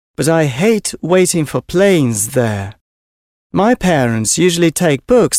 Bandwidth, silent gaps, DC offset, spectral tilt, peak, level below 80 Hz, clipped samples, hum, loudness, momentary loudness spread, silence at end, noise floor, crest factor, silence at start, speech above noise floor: 16.5 kHz; 2.81-3.50 s; under 0.1%; -4.5 dB/octave; 0 dBFS; -42 dBFS; under 0.1%; none; -14 LUFS; 6 LU; 0 s; under -90 dBFS; 12 dB; 0.2 s; over 77 dB